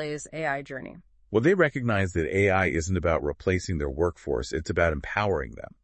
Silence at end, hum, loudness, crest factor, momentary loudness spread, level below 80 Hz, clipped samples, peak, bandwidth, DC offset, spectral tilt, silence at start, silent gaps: 0.15 s; none; -26 LUFS; 20 dB; 10 LU; -44 dBFS; under 0.1%; -8 dBFS; 8.8 kHz; under 0.1%; -6 dB/octave; 0 s; none